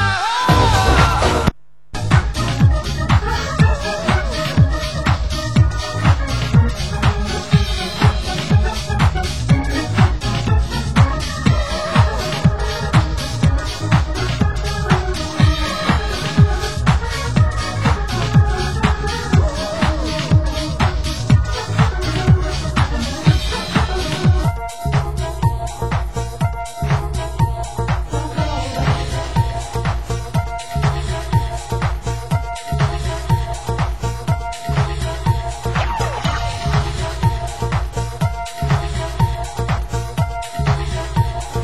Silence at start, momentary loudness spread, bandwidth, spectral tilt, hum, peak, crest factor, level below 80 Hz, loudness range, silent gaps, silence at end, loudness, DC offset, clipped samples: 0 s; 6 LU; 16 kHz; -5.5 dB/octave; none; 0 dBFS; 16 dB; -22 dBFS; 4 LU; none; 0 s; -18 LUFS; 2%; under 0.1%